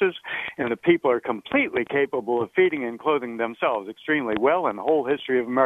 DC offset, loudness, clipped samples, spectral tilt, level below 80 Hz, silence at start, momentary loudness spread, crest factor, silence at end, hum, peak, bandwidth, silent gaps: under 0.1%; -24 LUFS; under 0.1%; -7 dB/octave; -64 dBFS; 0 s; 6 LU; 18 dB; 0 s; none; -6 dBFS; 3.9 kHz; none